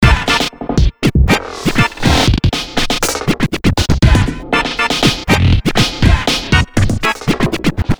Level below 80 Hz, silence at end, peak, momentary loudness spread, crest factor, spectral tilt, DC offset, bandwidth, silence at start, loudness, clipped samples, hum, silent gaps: -18 dBFS; 0.05 s; 0 dBFS; 4 LU; 12 dB; -5 dB/octave; under 0.1%; over 20 kHz; 0 s; -14 LUFS; 0.1%; none; none